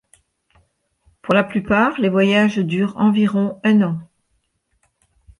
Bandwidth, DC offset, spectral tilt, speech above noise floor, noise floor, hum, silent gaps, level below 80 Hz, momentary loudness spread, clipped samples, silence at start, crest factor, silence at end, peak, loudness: 10.5 kHz; under 0.1%; -7 dB/octave; 52 dB; -68 dBFS; none; none; -54 dBFS; 5 LU; under 0.1%; 1.25 s; 16 dB; 1.35 s; -4 dBFS; -17 LUFS